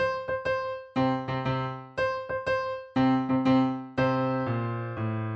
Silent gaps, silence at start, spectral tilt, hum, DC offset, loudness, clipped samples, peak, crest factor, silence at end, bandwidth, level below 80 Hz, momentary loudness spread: none; 0 s; -8 dB/octave; none; under 0.1%; -28 LUFS; under 0.1%; -12 dBFS; 16 dB; 0 s; 7 kHz; -56 dBFS; 8 LU